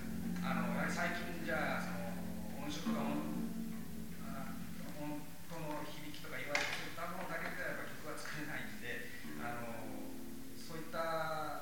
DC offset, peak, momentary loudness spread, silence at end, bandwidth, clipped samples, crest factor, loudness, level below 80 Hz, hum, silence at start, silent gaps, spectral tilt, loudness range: 0.6%; -18 dBFS; 10 LU; 0 s; 19.5 kHz; under 0.1%; 22 dB; -42 LUFS; -62 dBFS; none; 0 s; none; -5 dB/octave; 5 LU